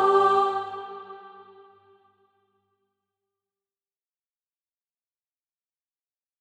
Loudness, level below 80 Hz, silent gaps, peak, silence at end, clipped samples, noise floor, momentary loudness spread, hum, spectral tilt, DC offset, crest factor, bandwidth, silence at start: -23 LUFS; -86 dBFS; none; -10 dBFS; 5.15 s; under 0.1%; under -90 dBFS; 25 LU; none; -4.5 dB/octave; under 0.1%; 22 dB; 8.8 kHz; 0 s